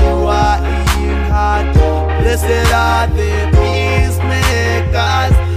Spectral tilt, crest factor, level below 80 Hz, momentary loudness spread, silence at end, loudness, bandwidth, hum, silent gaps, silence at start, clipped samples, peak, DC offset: -5.5 dB/octave; 12 dB; -16 dBFS; 3 LU; 0 s; -13 LUFS; 16 kHz; none; none; 0 s; under 0.1%; 0 dBFS; under 0.1%